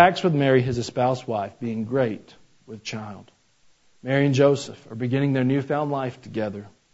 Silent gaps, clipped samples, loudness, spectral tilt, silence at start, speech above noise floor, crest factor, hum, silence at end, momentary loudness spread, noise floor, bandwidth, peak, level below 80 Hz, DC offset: none; under 0.1%; -23 LUFS; -6.5 dB/octave; 0 s; 38 dB; 24 dB; none; 0.25 s; 17 LU; -60 dBFS; 8 kHz; 0 dBFS; -58 dBFS; under 0.1%